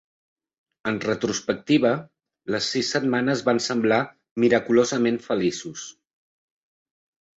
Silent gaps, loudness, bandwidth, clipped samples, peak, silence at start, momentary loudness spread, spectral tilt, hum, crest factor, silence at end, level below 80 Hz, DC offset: 4.31-4.36 s; -23 LUFS; 8 kHz; under 0.1%; -4 dBFS; 0.85 s; 12 LU; -4.5 dB/octave; none; 20 dB; 1.45 s; -64 dBFS; under 0.1%